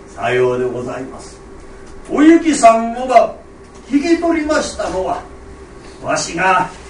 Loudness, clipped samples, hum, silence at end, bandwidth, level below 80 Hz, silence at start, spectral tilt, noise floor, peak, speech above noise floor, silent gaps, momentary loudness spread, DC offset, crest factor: -15 LUFS; under 0.1%; none; 0 s; 10.5 kHz; -40 dBFS; 0 s; -4.5 dB/octave; -35 dBFS; 0 dBFS; 21 dB; none; 17 LU; under 0.1%; 16 dB